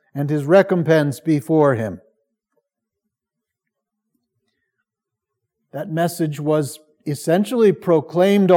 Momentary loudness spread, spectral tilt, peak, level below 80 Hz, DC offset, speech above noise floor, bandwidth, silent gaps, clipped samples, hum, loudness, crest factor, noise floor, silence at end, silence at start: 14 LU; -7 dB/octave; -2 dBFS; -72 dBFS; under 0.1%; 66 dB; 17.5 kHz; none; under 0.1%; none; -18 LUFS; 18 dB; -83 dBFS; 0 s; 0.15 s